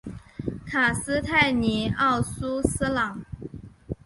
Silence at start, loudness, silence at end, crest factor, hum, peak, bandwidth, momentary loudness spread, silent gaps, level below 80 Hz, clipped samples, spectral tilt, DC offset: 0.05 s; -24 LUFS; 0.1 s; 20 dB; none; -6 dBFS; 11.5 kHz; 18 LU; none; -42 dBFS; under 0.1%; -4.5 dB/octave; under 0.1%